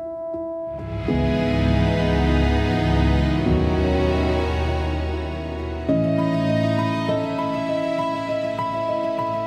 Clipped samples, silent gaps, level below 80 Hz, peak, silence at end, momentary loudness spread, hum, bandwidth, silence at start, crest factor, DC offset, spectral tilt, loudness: under 0.1%; none; -30 dBFS; -6 dBFS; 0 s; 9 LU; none; 9.6 kHz; 0 s; 14 dB; under 0.1%; -7.5 dB/octave; -22 LUFS